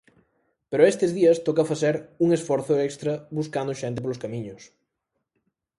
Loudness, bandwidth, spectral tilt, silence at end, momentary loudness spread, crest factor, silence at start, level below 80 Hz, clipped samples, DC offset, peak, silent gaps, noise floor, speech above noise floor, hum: -24 LUFS; 11.5 kHz; -6 dB/octave; 1.15 s; 11 LU; 20 dB; 0.7 s; -66 dBFS; under 0.1%; under 0.1%; -4 dBFS; none; -80 dBFS; 56 dB; none